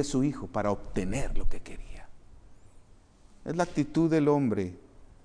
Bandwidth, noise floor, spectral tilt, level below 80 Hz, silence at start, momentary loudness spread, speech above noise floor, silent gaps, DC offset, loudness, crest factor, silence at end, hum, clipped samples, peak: 10.5 kHz; -56 dBFS; -6.5 dB/octave; -38 dBFS; 0 s; 20 LU; 29 dB; none; under 0.1%; -29 LUFS; 16 dB; 0.2 s; none; under 0.1%; -12 dBFS